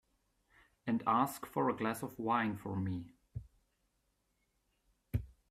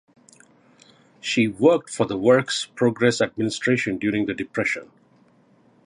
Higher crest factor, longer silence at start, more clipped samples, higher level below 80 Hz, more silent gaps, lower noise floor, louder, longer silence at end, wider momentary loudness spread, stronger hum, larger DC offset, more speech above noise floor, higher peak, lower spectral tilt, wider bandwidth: about the same, 20 dB vs 20 dB; second, 0.85 s vs 1.25 s; neither; about the same, -58 dBFS vs -60 dBFS; neither; first, -80 dBFS vs -57 dBFS; second, -37 LUFS vs -22 LUFS; second, 0.2 s vs 1 s; first, 16 LU vs 7 LU; neither; neither; first, 45 dB vs 36 dB; second, -18 dBFS vs -4 dBFS; first, -6.5 dB/octave vs -5 dB/octave; first, 15.5 kHz vs 11 kHz